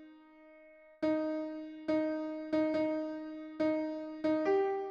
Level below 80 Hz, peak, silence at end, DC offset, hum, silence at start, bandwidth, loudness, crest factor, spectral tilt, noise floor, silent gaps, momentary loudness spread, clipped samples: -74 dBFS; -20 dBFS; 0 s; under 0.1%; none; 0 s; 6.6 kHz; -35 LUFS; 14 dB; -7 dB/octave; -58 dBFS; none; 10 LU; under 0.1%